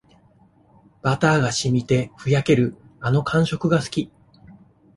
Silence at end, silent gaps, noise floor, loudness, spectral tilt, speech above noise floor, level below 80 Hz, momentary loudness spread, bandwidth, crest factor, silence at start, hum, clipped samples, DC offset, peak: 0.45 s; none; -55 dBFS; -21 LUFS; -6 dB/octave; 36 dB; -50 dBFS; 9 LU; 11.5 kHz; 18 dB; 1.05 s; none; under 0.1%; under 0.1%; -4 dBFS